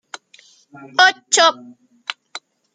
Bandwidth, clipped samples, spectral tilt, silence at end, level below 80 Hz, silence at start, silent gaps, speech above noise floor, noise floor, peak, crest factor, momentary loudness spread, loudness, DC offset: 9.6 kHz; under 0.1%; 1 dB/octave; 0.35 s; -78 dBFS; 0.8 s; none; 34 dB; -51 dBFS; -2 dBFS; 20 dB; 24 LU; -14 LUFS; under 0.1%